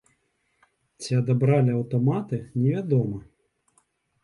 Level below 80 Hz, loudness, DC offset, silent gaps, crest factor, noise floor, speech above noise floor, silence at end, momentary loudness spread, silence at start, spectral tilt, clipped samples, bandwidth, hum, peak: -60 dBFS; -24 LUFS; under 0.1%; none; 16 dB; -71 dBFS; 48 dB; 1.05 s; 10 LU; 1 s; -8 dB/octave; under 0.1%; 11 kHz; none; -10 dBFS